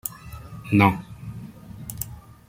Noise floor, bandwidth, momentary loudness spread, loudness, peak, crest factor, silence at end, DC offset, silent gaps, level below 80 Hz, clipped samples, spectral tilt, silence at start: -40 dBFS; 16.5 kHz; 22 LU; -23 LUFS; -2 dBFS; 24 dB; 0.35 s; under 0.1%; none; -48 dBFS; under 0.1%; -6 dB/octave; 0.05 s